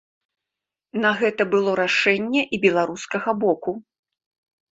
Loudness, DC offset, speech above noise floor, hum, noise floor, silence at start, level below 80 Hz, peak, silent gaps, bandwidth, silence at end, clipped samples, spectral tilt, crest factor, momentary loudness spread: -21 LUFS; under 0.1%; 66 dB; none; -87 dBFS; 0.95 s; -66 dBFS; -2 dBFS; none; 8 kHz; 0.9 s; under 0.1%; -4.5 dB/octave; 20 dB; 8 LU